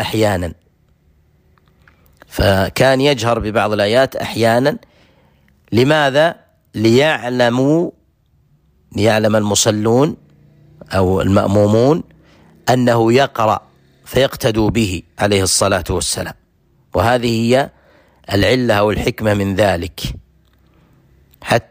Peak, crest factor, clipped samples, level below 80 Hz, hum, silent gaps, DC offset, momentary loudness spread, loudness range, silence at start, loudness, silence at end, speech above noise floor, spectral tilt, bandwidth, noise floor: -2 dBFS; 14 dB; under 0.1%; -38 dBFS; none; none; under 0.1%; 10 LU; 2 LU; 0 s; -15 LUFS; 0.1 s; 42 dB; -5 dB/octave; 15.5 kHz; -57 dBFS